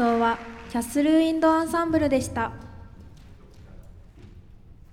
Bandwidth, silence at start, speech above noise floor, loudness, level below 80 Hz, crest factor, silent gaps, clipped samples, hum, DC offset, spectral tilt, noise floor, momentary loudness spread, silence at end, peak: 15.5 kHz; 0 s; 24 dB; -24 LUFS; -48 dBFS; 16 dB; none; under 0.1%; none; under 0.1%; -5.5 dB/octave; -47 dBFS; 12 LU; 0.2 s; -10 dBFS